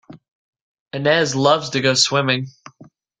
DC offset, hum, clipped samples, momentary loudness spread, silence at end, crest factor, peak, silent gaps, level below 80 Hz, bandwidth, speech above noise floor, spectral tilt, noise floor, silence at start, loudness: under 0.1%; none; under 0.1%; 9 LU; 0.7 s; 18 dB; -2 dBFS; 0.32-0.53 s, 0.61-0.86 s; -62 dBFS; 9.6 kHz; 31 dB; -3.5 dB/octave; -49 dBFS; 0.1 s; -17 LUFS